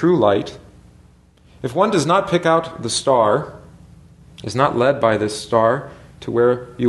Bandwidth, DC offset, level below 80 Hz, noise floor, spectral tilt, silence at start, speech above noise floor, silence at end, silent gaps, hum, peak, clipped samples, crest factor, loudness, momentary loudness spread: 12 kHz; under 0.1%; -52 dBFS; -50 dBFS; -5 dB/octave; 0 s; 33 dB; 0 s; none; none; 0 dBFS; under 0.1%; 18 dB; -18 LUFS; 15 LU